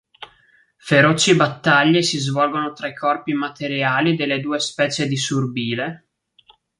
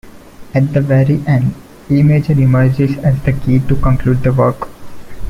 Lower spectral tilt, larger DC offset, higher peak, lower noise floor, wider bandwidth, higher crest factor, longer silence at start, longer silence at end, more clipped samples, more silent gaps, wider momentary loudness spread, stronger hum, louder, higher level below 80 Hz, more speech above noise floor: second, -4.5 dB/octave vs -9.5 dB/octave; neither; about the same, -2 dBFS vs 0 dBFS; first, -57 dBFS vs -33 dBFS; first, 11.5 kHz vs 6.6 kHz; first, 18 dB vs 12 dB; first, 0.2 s vs 0.05 s; first, 0.85 s vs 0 s; neither; neither; first, 10 LU vs 7 LU; neither; second, -19 LUFS vs -13 LUFS; second, -62 dBFS vs -28 dBFS; first, 38 dB vs 22 dB